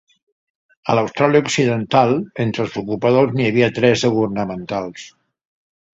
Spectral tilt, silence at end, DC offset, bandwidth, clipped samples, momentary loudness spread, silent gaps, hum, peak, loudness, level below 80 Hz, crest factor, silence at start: -5.5 dB/octave; 0.85 s; under 0.1%; 7.8 kHz; under 0.1%; 10 LU; none; none; 0 dBFS; -17 LUFS; -54 dBFS; 18 dB; 0.85 s